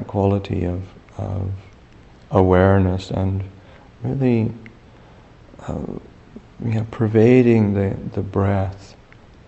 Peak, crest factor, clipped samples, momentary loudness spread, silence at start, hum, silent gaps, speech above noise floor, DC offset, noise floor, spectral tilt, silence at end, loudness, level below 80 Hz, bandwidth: 0 dBFS; 20 dB; under 0.1%; 19 LU; 0 s; none; none; 28 dB; under 0.1%; -46 dBFS; -9 dB/octave; 0.6 s; -20 LUFS; -44 dBFS; 8 kHz